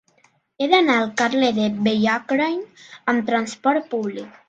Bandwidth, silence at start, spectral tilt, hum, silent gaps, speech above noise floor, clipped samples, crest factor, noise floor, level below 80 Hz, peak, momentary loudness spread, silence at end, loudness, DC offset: 9 kHz; 0.6 s; -4.5 dB/octave; none; none; 40 dB; under 0.1%; 20 dB; -61 dBFS; -64 dBFS; -2 dBFS; 10 LU; 0.2 s; -20 LUFS; under 0.1%